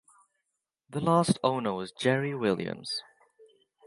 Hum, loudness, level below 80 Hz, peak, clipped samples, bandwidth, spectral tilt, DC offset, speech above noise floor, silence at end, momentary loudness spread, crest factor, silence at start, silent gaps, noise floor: none; -29 LUFS; -68 dBFS; -10 dBFS; under 0.1%; 11.5 kHz; -5.5 dB/octave; under 0.1%; 55 dB; 0.85 s; 10 LU; 22 dB; 0.9 s; none; -84 dBFS